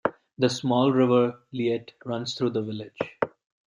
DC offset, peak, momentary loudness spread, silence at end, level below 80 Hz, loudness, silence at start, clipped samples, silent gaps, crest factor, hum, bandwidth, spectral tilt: under 0.1%; -8 dBFS; 12 LU; 0.4 s; -70 dBFS; -26 LUFS; 0.05 s; under 0.1%; none; 18 dB; none; 11 kHz; -6 dB/octave